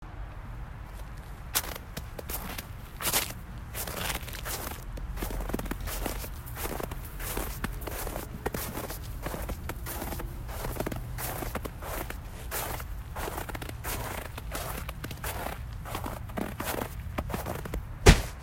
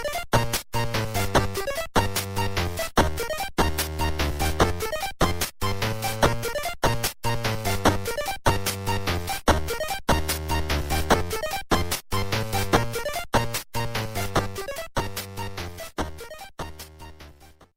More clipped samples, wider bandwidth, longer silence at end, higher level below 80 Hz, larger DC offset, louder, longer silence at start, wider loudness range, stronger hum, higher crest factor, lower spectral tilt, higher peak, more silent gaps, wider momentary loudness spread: neither; about the same, 16.5 kHz vs 16.5 kHz; second, 0 s vs 0.15 s; about the same, -38 dBFS vs -36 dBFS; neither; second, -34 LUFS vs -26 LUFS; about the same, 0 s vs 0 s; about the same, 3 LU vs 4 LU; neither; first, 32 dB vs 20 dB; about the same, -4 dB/octave vs -4 dB/octave; about the same, -2 dBFS vs -4 dBFS; neither; about the same, 9 LU vs 10 LU